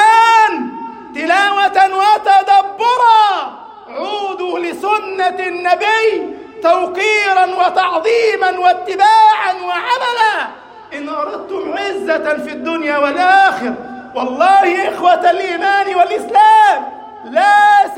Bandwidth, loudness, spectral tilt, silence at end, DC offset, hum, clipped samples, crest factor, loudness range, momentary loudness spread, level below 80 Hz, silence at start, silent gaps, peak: 15 kHz; -13 LUFS; -2 dB/octave; 0 s; under 0.1%; none; under 0.1%; 12 dB; 5 LU; 13 LU; -62 dBFS; 0 s; none; 0 dBFS